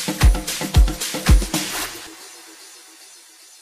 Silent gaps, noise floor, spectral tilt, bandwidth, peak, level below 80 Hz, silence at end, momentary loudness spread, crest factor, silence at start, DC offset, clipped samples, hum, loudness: none; -46 dBFS; -4 dB/octave; 15.5 kHz; -2 dBFS; -22 dBFS; 0.95 s; 23 LU; 18 dB; 0 s; under 0.1%; under 0.1%; none; -20 LUFS